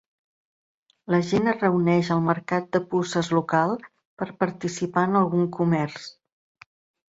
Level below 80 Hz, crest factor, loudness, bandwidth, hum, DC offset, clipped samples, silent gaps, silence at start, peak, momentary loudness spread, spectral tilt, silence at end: -64 dBFS; 18 dB; -24 LUFS; 8 kHz; none; under 0.1%; under 0.1%; 4.05-4.17 s; 1.1 s; -6 dBFS; 10 LU; -6.5 dB/octave; 1 s